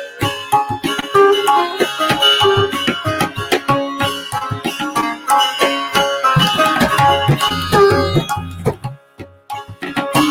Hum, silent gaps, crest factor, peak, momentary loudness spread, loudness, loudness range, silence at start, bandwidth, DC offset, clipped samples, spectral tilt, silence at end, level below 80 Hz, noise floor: none; none; 16 dB; 0 dBFS; 11 LU; -15 LUFS; 3 LU; 0 s; 17 kHz; under 0.1%; under 0.1%; -4 dB/octave; 0 s; -42 dBFS; -38 dBFS